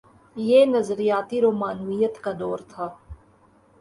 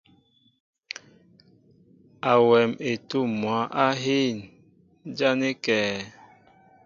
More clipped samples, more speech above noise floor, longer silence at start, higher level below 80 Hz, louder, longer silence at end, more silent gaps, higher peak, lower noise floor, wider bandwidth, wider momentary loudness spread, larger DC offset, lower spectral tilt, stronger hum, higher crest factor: neither; second, 35 dB vs 39 dB; second, 0.35 s vs 2.25 s; first, -56 dBFS vs -68 dBFS; about the same, -22 LUFS vs -24 LUFS; about the same, 0.65 s vs 0.75 s; neither; about the same, -6 dBFS vs -6 dBFS; second, -57 dBFS vs -62 dBFS; first, 11.5 kHz vs 7.4 kHz; second, 17 LU vs 20 LU; neither; first, -6.5 dB/octave vs -5 dB/octave; neither; about the same, 18 dB vs 20 dB